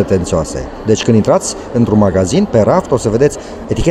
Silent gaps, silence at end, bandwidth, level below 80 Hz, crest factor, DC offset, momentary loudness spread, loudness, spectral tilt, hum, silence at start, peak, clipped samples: none; 0 s; 12 kHz; -30 dBFS; 12 dB; under 0.1%; 8 LU; -13 LUFS; -6 dB/octave; none; 0 s; 0 dBFS; under 0.1%